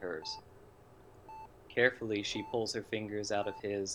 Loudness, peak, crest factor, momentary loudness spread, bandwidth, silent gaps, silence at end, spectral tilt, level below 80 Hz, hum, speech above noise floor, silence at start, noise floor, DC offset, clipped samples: -35 LUFS; -12 dBFS; 24 dB; 21 LU; 15 kHz; none; 0 s; -3.5 dB/octave; -66 dBFS; none; 23 dB; 0 s; -58 dBFS; under 0.1%; under 0.1%